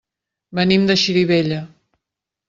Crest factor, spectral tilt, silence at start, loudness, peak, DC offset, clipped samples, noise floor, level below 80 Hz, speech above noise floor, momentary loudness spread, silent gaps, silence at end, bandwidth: 16 dB; -5.5 dB/octave; 0.5 s; -16 LUFS; -2 dBFS; under 0.1%; under 0.1%; -84 dBFS; -54 dBFS; 67 dB; 12 LU; none; 0.8 s; 7.6 kHz